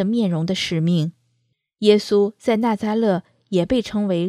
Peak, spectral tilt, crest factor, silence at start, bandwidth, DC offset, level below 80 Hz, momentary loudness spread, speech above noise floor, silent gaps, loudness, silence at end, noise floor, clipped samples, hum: -2 dBFS; -6.5 dB/octave; 18 dB; 0 s; 13.5 kHz; under 0.1%; -52 dBFS; 6 LU; 51 dB; none; -20 LUFS; 0 s; -70 dBFS; under 0.1%; none